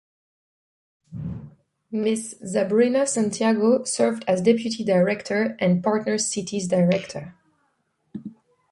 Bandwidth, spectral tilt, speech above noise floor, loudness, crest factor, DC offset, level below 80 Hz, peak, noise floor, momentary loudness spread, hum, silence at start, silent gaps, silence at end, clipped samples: 11.5 kHz; -5 dB/octave; 49 dB; -22 LUFS; 18 dB; under 0.1%; -58 dBFS; -6 dBFS; -70 dBFS; 19 LU; none; 1.1 s; none; 0.4 s; under 0.1%